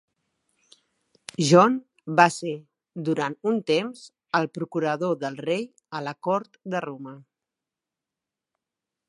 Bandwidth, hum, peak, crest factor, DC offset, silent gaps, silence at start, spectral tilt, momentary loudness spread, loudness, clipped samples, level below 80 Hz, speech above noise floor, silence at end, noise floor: 11.5 kHz; none; -2 dBFS; 26 dB; under 0.1%; none; 1.4 s; -5 dB/octave; 18 LU; -24 LUFS; under 0.1%; -76 dBFS; 64 dB; 1.9 s; -88 dBFS